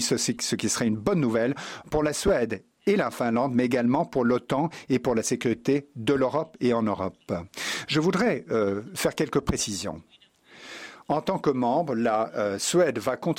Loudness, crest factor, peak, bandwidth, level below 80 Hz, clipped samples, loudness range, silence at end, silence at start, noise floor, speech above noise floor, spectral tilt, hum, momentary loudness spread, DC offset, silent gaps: -26 LUFS; 14 dB; -12 dBFS; 16.5 kHz; -52 dBFS; under 0.1%; 3 LU; 0 s; 0 s; -55 dBFS; 30 dB; -4.5 dB/octave; none; 7 LU; under 0.1%; none